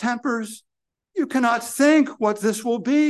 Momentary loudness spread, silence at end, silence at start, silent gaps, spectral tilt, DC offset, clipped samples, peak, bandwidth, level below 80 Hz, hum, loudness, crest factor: 13 LU; 0 s; 0 s; none; -4 dB/octave; under 0.1%; under 0.1%; -4 dBFS; 12.5 kHz; -74 dBFS; none; -21 LUFS; 16 dB